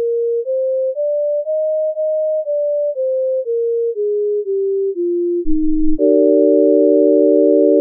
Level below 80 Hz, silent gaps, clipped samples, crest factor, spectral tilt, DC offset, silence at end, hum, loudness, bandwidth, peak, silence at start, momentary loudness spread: -32 dBFS; none; under 0.1%; 12 dB; -16.5 dB/octave; under 0.1%; 0 s; none; -16 LUFS; 0.7 kHz; -2 dBFS; 0 s; 7 LU